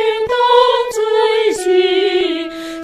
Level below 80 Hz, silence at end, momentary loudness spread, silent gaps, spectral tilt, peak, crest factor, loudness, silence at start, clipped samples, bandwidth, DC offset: -52 dBFS; 0 s; 7 LU; none; -2.5 dB/octave; 0 dBFS; 14 dB; -14 LUFS; 0 s; under 0.1%; 14 kHz; under 0.1%